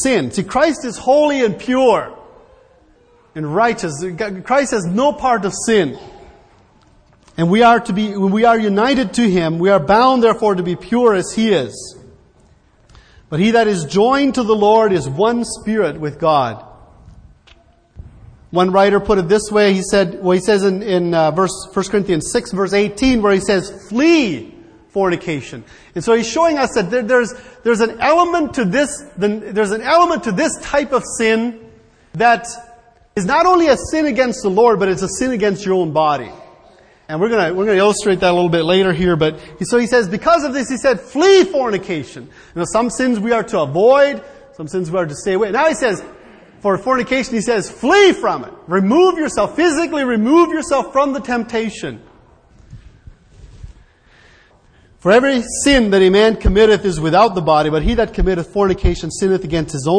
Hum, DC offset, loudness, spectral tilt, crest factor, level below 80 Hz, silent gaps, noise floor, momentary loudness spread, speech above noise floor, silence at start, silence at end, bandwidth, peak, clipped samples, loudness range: none; under 0.1%; -15 LUFS; -5 dB/octave; 16 dB; -34 dBFS; none; -51 dBFS; 11 LU; 36 dB; 0 s; 0 s; 10.5 kHz; 0 dBFS; under 0.1%; 5 LU